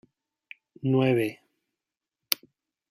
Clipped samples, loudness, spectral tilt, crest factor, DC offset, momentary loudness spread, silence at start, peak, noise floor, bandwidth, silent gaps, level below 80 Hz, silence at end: under 0.1%; -27 LUFS; -5.5 dB/octave; 30 dB; under 0.1%; 9 LU; 0.85 s; 0 dBFS; -88 dBFS; 15.5 kHz; none; -74 dBFS; 0.55 s